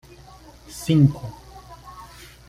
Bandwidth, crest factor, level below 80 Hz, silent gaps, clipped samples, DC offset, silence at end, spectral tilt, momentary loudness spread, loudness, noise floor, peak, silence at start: 15 kHz; 20 dB; -48 dBFS; none; under 0.1%; under 0.1%; 0.45 s; -7 dB/octave; 25 LU; -20 LUFS; -46 dBFS; -6 dBFS; 0.75 s